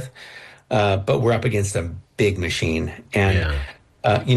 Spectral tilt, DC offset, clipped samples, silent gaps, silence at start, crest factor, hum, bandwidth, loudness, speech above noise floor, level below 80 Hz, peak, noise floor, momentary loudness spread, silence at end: -5.5 dB/octave; under 0.1%; under 0.1%; none; 0 s; 14 dB; none; 12.5 kHz; -21 LUFS; 22 dB; -36 dBFS; -8 dBFS; -42 dBFS; 17 LU; 0 s